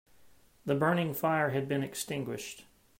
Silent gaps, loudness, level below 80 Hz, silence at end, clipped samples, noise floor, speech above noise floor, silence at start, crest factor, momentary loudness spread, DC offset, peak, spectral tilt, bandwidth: none; -32 LUFS; -70 dBFS; 0.35 s; under 0.1%; -63 dBFS; 31 dB; 0.2 s; 18 dB; 14 LU; under 0.1%; -14 dBFS; -5.5 dB/octave; 16 kHz